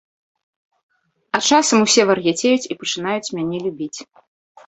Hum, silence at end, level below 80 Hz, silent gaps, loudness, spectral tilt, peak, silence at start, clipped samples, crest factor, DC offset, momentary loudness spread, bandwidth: none; 0.65 s; -64 dBFS; none; -17 LUFS; -3 dB/octave; 0 dBFS; 1.35 s; under 0.1%; 20 dB; under 0.1%; 13 LU; 8.4 kHz